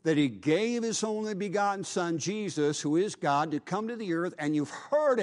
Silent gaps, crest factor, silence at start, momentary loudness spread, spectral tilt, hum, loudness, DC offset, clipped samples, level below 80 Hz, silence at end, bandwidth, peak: none; 14 dB; 0.05 s; 5 LU; -5 dB/octave; none; -30 LUFS; under 0.1%; under 0.1%; -76 dBFS; 0 s; 11.5 kHz; -14 dBFS